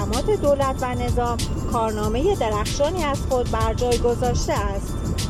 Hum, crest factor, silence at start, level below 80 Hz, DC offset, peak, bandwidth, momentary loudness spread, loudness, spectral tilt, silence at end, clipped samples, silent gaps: none; 14 dB; 0 s; -28 dBFS; under 0.1%; -8 dBFS; 16 kHz; 4 LU; -22 LUFS; -5.5 dB/octave; 0 s; under 0.1%; none